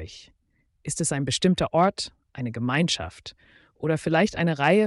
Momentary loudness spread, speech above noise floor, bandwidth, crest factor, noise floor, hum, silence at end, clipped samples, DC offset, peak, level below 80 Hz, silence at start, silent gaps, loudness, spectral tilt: 16 LU; 35 dB; 11.5 kHz; 16 dB; -59 dBFS; none; 0 s; under 0.1%; under 0.1%; -8 dBFS; -52 dBFS; 0 s; none; -25 LUFS; -4.5 dB/octave